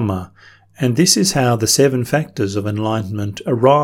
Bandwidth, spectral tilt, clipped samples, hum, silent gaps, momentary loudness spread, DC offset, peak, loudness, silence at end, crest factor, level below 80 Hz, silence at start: 17.5 kHz; -4.5 dB/octave; under 0.1%; none; none; 9 LU; under 0.1%; 0 dBFS; -16 LUFS; 0 s; 16 dB; -50 dBFS; 0 s